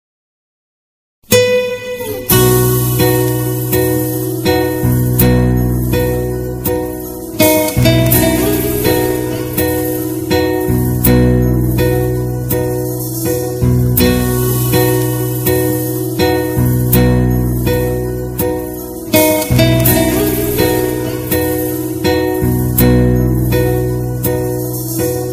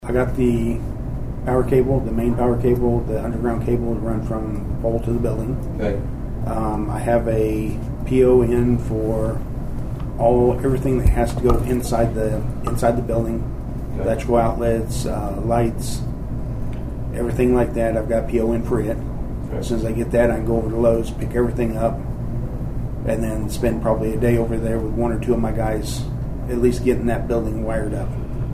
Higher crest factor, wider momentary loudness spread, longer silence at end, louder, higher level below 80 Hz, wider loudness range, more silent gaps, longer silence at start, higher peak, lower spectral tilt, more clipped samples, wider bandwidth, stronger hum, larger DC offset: about the same, 14 dB vs 16 dB; second, 7 LU vs 10 LU; about the same, 0 s vs 0 s; first, -13 LUFS vs -21 LUFS; about the same, -26 dBFS vs -28 dBFS; about the same, 1 LU vs 3 LU; neither; first, 1.3 s vs 0 s; first, 0 dBFS vs -4 dBFS; second, -5.5 dB/octave vs -8 dB/octave; neither; about the same, 16 kHz vs 15.5 kHz; neither; neither